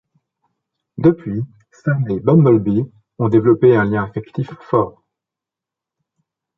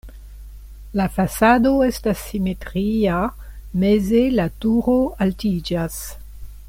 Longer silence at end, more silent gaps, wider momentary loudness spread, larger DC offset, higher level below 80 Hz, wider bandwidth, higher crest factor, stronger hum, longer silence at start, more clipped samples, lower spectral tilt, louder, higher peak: first, 1.7 s vs 0 s; neither; about the same, 14 LU vs 12 LU; neither; second, -50 dBFS vs -36 dBFS; second, 5.8 kHz vs 16.5 kHz; about the same, 16 dB vs 16 dB; neither; first, 1 s vs 0.05 s; neither; first, -10.5 dB/octave vs -6.5 dB/octave; first, -17 LUFS vs -20 LUFS; about the same, -2 dBFS vs -4 dBFS